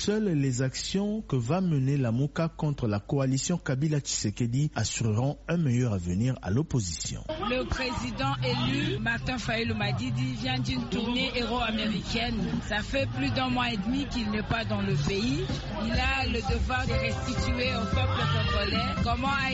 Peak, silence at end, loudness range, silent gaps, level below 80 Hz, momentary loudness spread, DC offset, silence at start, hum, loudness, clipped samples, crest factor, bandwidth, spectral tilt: -14 dBFS; 0 s; 1 LU; none; -40 dBFS; 4 LU; under 0.1%; 0 s; none; -28 LUFS; under 0.1%; 14 dB; 8 kHz; -5 dB/octave